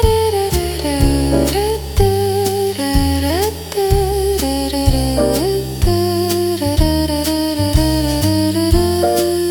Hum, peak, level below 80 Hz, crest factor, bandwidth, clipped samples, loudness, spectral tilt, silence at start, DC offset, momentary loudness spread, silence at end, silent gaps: none; 0 dBFS; -22 dBFS; 14 dB; 19 kHz; under 0.1%; -16 LUFS; -5.5 dB/octave; 0 s; under 0.1%; 3 LU; 0 s; none